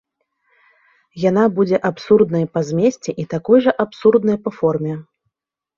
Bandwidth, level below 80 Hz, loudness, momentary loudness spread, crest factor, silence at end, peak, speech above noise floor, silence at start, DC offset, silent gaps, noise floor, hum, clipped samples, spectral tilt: 7.4 kHz; -58 dBFS; -17 LUFS; 10 LU; 16 dB; 0.75 s; -2 dBFS; 61 dB; 1.15 s; under 0.1%; none; -77 dBFS; none; under 0.1%; -7.5 dB/octave